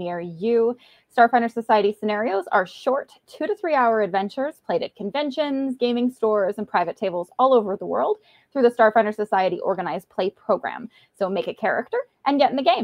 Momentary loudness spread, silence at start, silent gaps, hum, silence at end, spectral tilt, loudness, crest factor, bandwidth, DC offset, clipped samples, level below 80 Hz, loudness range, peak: 10 LU; 0 s; none; none; 0 s; -6.5 dB/octave; -22 LUFS; 18 dB; 12 kHz; under 0.1%; under 0.1%; -72 dBFS; 3 LU; -4 dBFS